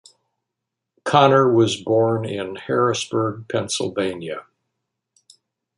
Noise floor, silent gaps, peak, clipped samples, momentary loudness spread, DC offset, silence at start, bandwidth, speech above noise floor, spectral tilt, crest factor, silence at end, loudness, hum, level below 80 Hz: -82 dBFS; none; -2 dBFS; under 0.1%; 15 LU; under 0.1%; 1.05 s; 11.5 kHz; 63 dB; -5 dB/octave; 20 dB; 1.35 s; -20 LUFS; none; -60 dBFS